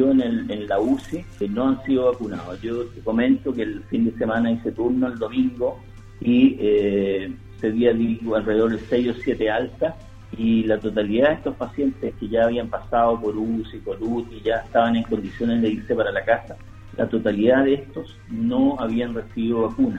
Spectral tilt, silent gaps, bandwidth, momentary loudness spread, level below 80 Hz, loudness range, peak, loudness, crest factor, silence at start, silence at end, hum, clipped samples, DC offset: -8 dB/octave; none; 7.8 kHz; 9 LU; -44 dBFS; 2 LU; -4 dBFS; -22 LUFS; 18 dB; 0 s; 0 s; none; under 0.1%; under 0.1%